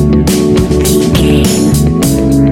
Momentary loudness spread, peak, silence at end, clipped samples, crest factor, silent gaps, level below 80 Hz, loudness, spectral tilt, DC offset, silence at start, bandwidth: 1 LU; 0 dBFS; 0 s; 0.2%; 8 dB; none; -18 dBFS; -9 LUFS; -6 dB/octave; under 0.1%; 0 s; 17 kHz